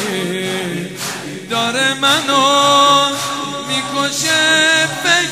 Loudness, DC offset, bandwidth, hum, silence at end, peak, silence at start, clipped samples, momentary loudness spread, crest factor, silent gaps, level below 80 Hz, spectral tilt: -14 LUFS; 0.2%; 16 kHz; none; 0 s; 0 dBFS; 0 s; under 0.1%; 12 LU; 16 dB; none; -62 dBFS; -2 dB/octave